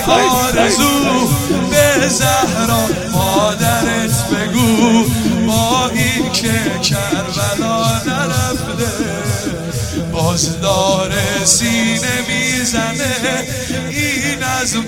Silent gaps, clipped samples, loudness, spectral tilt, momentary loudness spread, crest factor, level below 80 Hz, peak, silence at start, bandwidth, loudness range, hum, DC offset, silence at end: none; under 0.1%; -14 LUFS; -3.5 dB/octave; 7 LU; 14 dB; -36 dBFS; 0 dBFS; 0 s; 16.5 kHz; 4 LU; none; under 0.1%; 0 s